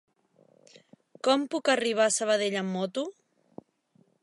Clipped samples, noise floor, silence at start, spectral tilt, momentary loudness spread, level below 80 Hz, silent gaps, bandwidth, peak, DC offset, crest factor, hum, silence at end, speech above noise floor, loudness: under 0.1%; -66 dBFS; 1.25 s; -3 dB/octave; 8 LU; -84 dBFS; none; 11.5 kHz; -10 dBFS; under 0.1%; 20 dB; none; 1.1 s; 40 dB; -27 LUFS